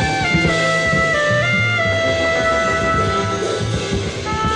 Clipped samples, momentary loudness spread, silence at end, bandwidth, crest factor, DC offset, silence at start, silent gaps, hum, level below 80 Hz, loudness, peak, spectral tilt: under 0.1%; 6 LU; 0 s; 10.5 kHz; 14 dB; under 0.1%; 0 s; none; none; -34 dBFS; -16 LUFS; -4 dBFS; -4.5 dB/octave